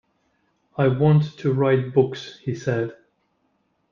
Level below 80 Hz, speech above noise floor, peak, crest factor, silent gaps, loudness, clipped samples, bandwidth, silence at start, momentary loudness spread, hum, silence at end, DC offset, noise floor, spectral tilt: -58 dBFS; 48 dB; -4 dBFS; 18 dB; none; -22 LUFS; under 0.1%; 7 kHz; 0.8 s; 13 LU; none; 1 s; under 0.1%; -69 dBFS; -8.5 dB/octave